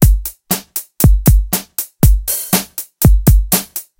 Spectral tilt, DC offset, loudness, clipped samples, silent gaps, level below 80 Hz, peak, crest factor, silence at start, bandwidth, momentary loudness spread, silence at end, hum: -5 dB/octave; under 0.1%; -14 LUFS; under 0.1%; none; -16 dBFS; 0 dBFS; 12 dB; 0 s; 17.5 kHz; 9 LU; 0.15 s; none